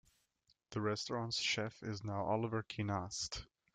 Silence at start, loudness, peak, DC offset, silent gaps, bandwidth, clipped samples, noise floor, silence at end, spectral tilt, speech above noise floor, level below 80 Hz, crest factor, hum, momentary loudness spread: 0.7 s; -40 LUFS; -22 dBFS; under 0.1%; none; 9.4 kHz; under 0.1%; -78 dBFS; 0.3 s; -4 dB/octave; 39 dB; -66 dBFS; 18 dB; none; 7 LU